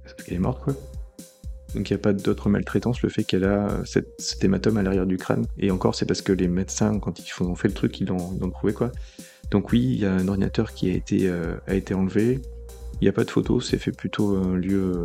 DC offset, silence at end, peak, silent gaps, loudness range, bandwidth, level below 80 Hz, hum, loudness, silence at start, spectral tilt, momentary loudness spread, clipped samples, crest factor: under 0.1%; 0 s; -4 dBFS; none; 2 LU; 15 kHz; -38 dBFS; none; -24 LUFS; 0 s; -6.5 dB/octave; 10 LU; under 0.1%; 20 dB